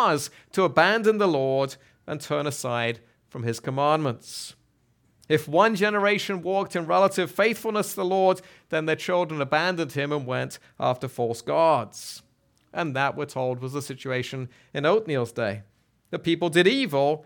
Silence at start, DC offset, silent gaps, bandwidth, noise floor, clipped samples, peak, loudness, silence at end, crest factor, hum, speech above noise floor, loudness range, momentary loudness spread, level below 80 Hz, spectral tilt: 0 s; under 0.1%; none; 19 kHz; -65 dBFS; under 0.1%; -4 dBFS; -25 LUFS; 0.05 s; 20 dB; none; 41 dB; 5 LU; 15 LU; -70 dBFS; -5 dB/octave